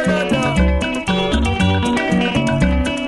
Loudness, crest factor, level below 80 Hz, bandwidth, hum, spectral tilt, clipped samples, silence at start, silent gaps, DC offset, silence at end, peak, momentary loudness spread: -17 LUFS; 12 dB; -24 dBFS; 11.5 kHz; none; -6 dB/octave; under 0.1%; 0 s; none; under 0.1%; 0 s; -4 dBFS; 2 LU